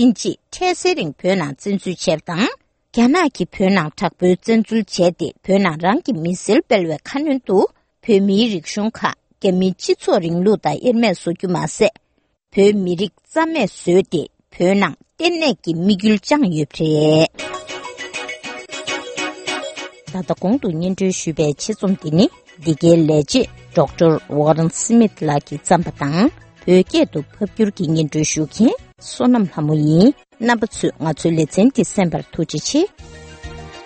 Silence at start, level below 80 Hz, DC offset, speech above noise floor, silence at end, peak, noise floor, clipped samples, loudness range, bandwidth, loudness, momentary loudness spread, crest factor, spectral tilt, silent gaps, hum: 0 s; -50 dBFS; under 0.1%; 44 dB; 0 s; 0 dBFS; -60 dBFS; under 0.1%; 3 LU; 8.8 kHz; -17 LUFS; 10 LU; 18 dB; -5.5 dB/octave; none; none